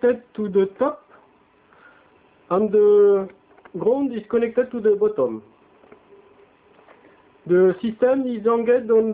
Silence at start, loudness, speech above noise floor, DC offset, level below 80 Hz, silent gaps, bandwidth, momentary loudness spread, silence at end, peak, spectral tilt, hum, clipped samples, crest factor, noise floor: 0.05 s; -20 LUFS; 37 dB; under 0.1%; -64 dBFS; none; 3.9 kHz; 10 LU; 0 s; -8 dBFS; -11.5 dB/octave; none; under 0.1%; 14 dB; -56 dBFS